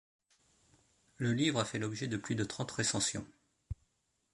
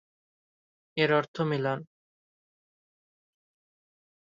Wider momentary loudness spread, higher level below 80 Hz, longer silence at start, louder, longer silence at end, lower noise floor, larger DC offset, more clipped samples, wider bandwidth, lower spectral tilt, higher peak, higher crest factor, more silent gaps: first, 17 LU vs 11 LU; first, -60 dBFS vs -76 dBFS; first, 1.2 s vs 0.95 s; second, -35 LUFS vs -29 LUFS; second, 0.6 s vs 2.5 s; second, -79 dBFS vs under -90 dBFS; neither; neither; first, 11.5 kHz vs 7.6 kHz; second, -4 dB/octave vs -7 dB/octave; second, -16 dBFS vs -12 dBFS; about the same, 22 dB vs 22 dB; second, none vs 1.28-1.34 s